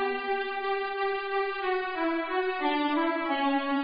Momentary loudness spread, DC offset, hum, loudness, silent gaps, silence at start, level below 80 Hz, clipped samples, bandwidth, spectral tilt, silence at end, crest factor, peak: 3 LU; 0.3%; none; -29 LUFS; none; 0 s; -62 dBFS; under 0.1%; 5.2 kHz; -6.5 dB/octave; 0 s; 14 dB; -16 dBFS